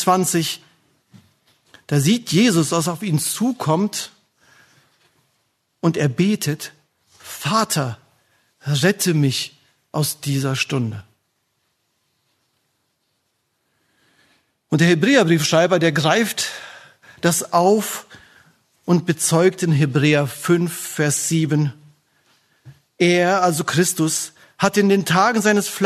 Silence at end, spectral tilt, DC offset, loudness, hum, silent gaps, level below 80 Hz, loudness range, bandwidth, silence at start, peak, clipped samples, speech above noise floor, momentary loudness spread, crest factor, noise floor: 0 s; -4.5 dB/octave; under 0.1%; -18 LUFS; none; none; -62 dBFS; 7 LU; 13.5 kHz; 0 s; 0 dBFS; under 0.1%; 52 dB; 12 LU; 20 dB; -70 dBFS